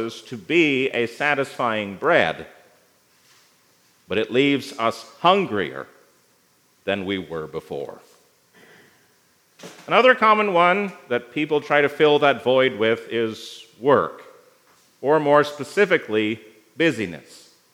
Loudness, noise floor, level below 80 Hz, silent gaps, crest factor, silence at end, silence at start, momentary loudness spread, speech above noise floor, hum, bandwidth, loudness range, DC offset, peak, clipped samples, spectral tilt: -20 LUFS; -61 dBFS; -70 dBFS; none; 20 dB; 0.55 s; 0 s; 15 LU; 40 dB; none; 15.5 kHz; 11 LU; under 0.1%; -2 dBFS; under 0.1%; -5 dB/octave